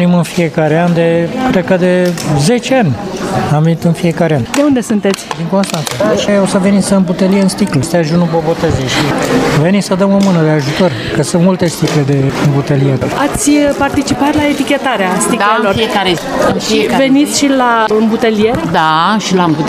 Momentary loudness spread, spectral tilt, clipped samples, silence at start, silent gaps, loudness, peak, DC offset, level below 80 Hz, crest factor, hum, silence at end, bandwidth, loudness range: 3 LU; -5.5 dB/octave; under 0.1%; 0 s; none; -11 LUFS; 0 dBFS; under 0.1%; -38 dBFS; 10 dB; none; 0 s; 15.5 kHz; 1 LU